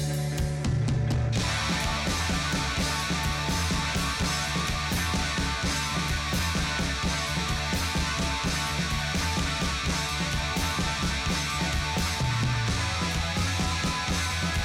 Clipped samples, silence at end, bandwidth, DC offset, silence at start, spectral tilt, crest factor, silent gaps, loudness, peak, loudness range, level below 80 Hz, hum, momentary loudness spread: under 0.1%; 0 s; 18 kHz; under 0.1%; 0 s; -3.5 dB/octave; 10 dB; none; -27 LUFS; -16 dBFS; 0 LU; -36 dBFS; none; 1 LU